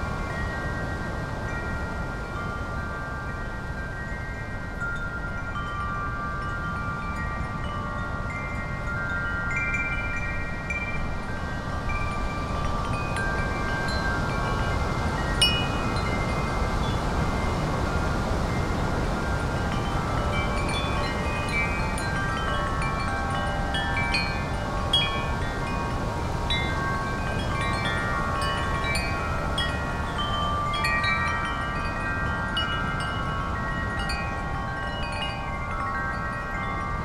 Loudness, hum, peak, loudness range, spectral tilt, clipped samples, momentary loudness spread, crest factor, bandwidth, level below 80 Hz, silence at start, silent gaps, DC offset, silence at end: -28 LUFS; none; -6 dBFS; 6 LU; -5 dB/octave; under 0.1%; 6 LU; 20 dB; 15.5 kHz; -34 dBFS; 0 s; none; under 0.1%; 0 s